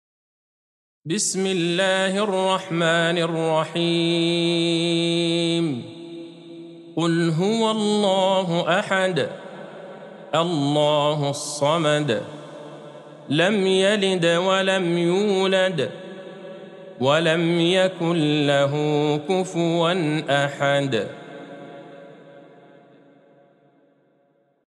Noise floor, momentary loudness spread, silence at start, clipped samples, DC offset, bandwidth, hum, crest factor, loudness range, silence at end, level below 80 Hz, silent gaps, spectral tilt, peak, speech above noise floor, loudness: -63 dBFS; 20 LU; 1.05 s; under 0.1%; under 0.1%; 12 kHz; none; 16 dB; 3 LU; 2.25 s; -76 dBFS; none; -4.5 dB/octave; -6 dBFS; 43 dB; -21 LUFS